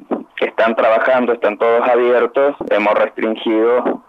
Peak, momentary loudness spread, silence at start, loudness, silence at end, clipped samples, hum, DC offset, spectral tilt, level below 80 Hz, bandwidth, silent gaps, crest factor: -4 dBFS; 6 LU; 0.1 s; -15 LUFS; 0.1 s; under 0.1%; none; under 0.1%; -6.5 dB/octave; -64 dBFS; 6 kHz; none; 12 dB